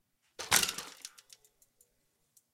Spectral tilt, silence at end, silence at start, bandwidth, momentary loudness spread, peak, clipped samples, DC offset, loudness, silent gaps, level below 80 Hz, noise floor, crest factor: 0.5 dB/octave; 1.45 s; 0.4 s; 16.5 kHz; 21 LU; -6 dBFS; under 0.1%; under 0.1%; -29 LUFS; none; -66 dBFS; -77 dBFS; 32 dB